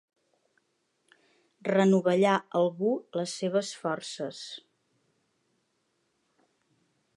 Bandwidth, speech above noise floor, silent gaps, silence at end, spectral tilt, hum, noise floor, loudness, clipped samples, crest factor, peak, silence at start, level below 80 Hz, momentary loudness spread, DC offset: 11.5 kHz; 48 dB; none; 2.55 s; -5.5 dB/octave; none; -76 dBFS; -28 LUFS; under 0.1%; 22 dB; -10 dBFS; 1.65 s; -84 dBFS; 14 LU; under 0.1%